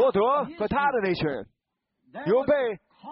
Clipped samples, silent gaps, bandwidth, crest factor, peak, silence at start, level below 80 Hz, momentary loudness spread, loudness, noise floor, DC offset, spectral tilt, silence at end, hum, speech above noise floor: under 0.1%; none; 5.8 kHz; 14 dB; -12 dBFS; 0 s; -56 dBFS; 14 LU; -25 LUFS; -81 dBFS; under 0.1%; -4.5 dB/octave; 0 s; none; 55 dB